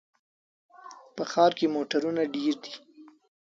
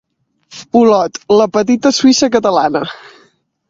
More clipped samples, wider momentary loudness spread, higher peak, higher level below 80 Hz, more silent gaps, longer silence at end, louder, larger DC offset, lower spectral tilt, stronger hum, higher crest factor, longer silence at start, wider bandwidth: neither; first, 21 LU vs 6 LU; second, -8 dBFS vs 0 dBFS; second, -78 dBFS vs -54 dBFS; neither; second, 0.4 s vs 0.75 s; second, -27 LUFS vs -12 LUFS; neither; about the same, -5 dB/octave vs -4 dB/octave; neither; first, 22 dB vs 14 dB; first, 0.85 s vs 0.5 s; about the same, 7.6 kHz vs 7.8 kHz